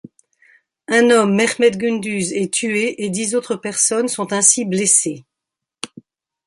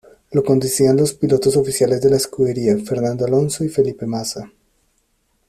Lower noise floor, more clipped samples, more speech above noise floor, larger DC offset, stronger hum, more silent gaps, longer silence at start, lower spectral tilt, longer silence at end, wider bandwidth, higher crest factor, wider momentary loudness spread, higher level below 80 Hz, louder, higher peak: first, -83 dBFS vs -64 dBFS; neither; first, 66 dB vs 48 dB; neither; neither; neither; first, 0.9 s vs 0.3 s; second, -3 dB/octave vs -5.5 dB/octave; second, 0.6 s vs 1 s; second, 11.5 kHz vs 14.5 kHz; about the same, 18 dB vs 16 dB; first, 13 LU vs 8 LU; second, -64 dBFS vs -52 dBFS; about the same, -16 LUFS vs -17 LUFS; about the same, 0 dBFS vs -2 dBFS